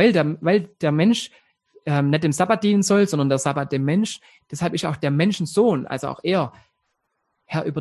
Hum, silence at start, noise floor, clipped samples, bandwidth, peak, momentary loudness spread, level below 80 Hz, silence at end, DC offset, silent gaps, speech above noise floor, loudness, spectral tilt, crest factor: none; 0 s; -74 dBFS; under 0.1%; 12.5 kHz; -4 dBFS; 10 LU; -60 dBFS; 0 s; under 0.1%; none; 54 dB; -21 LUFS; -6 dB/octave; 18 dB